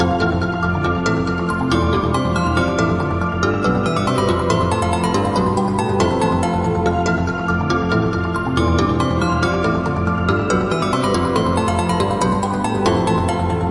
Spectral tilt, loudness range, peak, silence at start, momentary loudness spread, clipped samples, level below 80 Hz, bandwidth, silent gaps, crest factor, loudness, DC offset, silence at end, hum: -6.5 dB/octave; 1 LU; -2 dBFS; 0 s; 2 LU; under 0.1%; -36 dBFS; 11.5 kHz; none; 14 dB; -18 LUFS; under 0.1%; 0 s; none